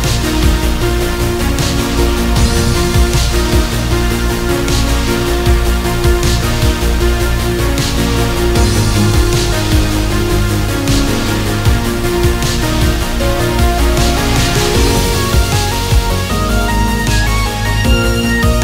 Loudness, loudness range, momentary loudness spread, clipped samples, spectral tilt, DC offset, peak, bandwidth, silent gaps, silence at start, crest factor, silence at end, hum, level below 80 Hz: -13 LUFS; 1 LU; 3 LU; under 0.1%; -4.5 dB/octave; under 0.1%; 0 dBFS; 16.5 kHz; none; 0 s; 12 dB; 0 s; none; -16 dBFS